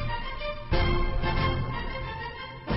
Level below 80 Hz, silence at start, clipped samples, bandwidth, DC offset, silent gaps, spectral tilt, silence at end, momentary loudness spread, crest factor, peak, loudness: -32 dBFS; 0 s; under 0.1%; 5.8 kHz; under 0.1%; none; -9 dB/octave; 0 s; 9 LU; 16 dB; -12 dBFS; -30 LUFS